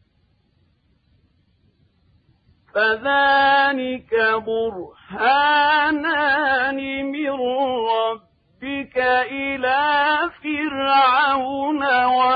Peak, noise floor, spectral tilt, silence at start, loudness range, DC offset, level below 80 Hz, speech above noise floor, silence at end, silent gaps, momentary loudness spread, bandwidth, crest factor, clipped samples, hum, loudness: -6 dBFS; -63 dBFS; -6.5 dB/octave; 2.75 s; 4 LU; under 0.1%; -58 dBFS; 44 dB; 0 s; none; 10 LU; 5 kHz; 14 dB; under 0.1%; none; -19 LUFS